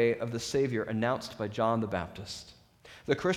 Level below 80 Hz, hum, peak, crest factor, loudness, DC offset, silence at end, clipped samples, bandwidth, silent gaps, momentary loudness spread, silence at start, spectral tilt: -60 dBFS; none; -12 dBFS; 20 dB; -32 LUFS; under 0.1%; 0 s; under 0.1%; 15.5 kHz; none; 13 LU; 0 s; -5.5 dB/octave